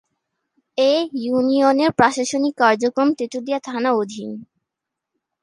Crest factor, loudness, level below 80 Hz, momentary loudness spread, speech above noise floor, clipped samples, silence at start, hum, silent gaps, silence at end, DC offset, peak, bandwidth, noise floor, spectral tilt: 20 dB; -19 LUFS; -62 dBFS; 12 LU; 65 dB; under 0.1%; 0.75 s; none; none; 1 s; under 0.1%; 0 dBFS; 11 kHz; -83 dBFS; -4 dB/octave